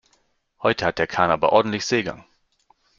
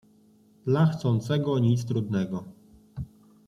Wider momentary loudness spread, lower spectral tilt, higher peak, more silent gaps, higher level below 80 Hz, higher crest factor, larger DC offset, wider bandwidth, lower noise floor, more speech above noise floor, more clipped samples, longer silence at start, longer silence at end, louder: second, 6 LU vs 17 LU; second, -4.5 dB/octave vs -8 dB/octave; first, -2 dBFS vs -10 dBFS; neither; about the same, -56 dBFS vs -58 dBFS; about the same, 20 dB vs 16 dB; neither; second, 7.6 kHz vs 11 kHz; first, -66 dBFS vs -59 dBFS; first, 45 dB vs 34 dB; neither; about the same, 0.6 s vs 0.65 s; first, 0.75 s vs 0.4 s; first, -21 LUFS vs -26 LUFS